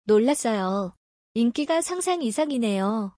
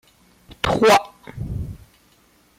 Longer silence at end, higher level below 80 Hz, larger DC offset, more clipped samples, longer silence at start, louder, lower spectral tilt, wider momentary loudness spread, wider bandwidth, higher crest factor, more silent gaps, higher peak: second, 0.05 s vs 0.85 s; second, -68 dBFS vs -42 dBFS; neither; neither; second, 0.05 s vs 0.5 s; second, -24 LUFS vs -19 LUFS; about the same, -4.5 dB/octave vs -4.5 dB/octave; second, 7 LU vs 20 LU; second, 10.5 kHz vs 16 kHz; about the same, 14 dB vs 16 dB; first, 0.97-1.35 s vs none; second, -10 dBFS vs -6 dBFS